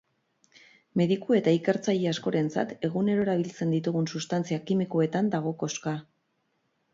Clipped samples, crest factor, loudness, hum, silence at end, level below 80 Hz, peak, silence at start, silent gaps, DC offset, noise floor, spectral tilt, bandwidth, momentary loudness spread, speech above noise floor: under 0.1%; 16 dB; -28 LUFS; none; 0.9 s; -70 dBFS; -12 dBFS; 0.95 s; none; under 0.1%; -74 dBFS; -6.5 dB/octave; 7.8 kHz; 7 LU; 48 dB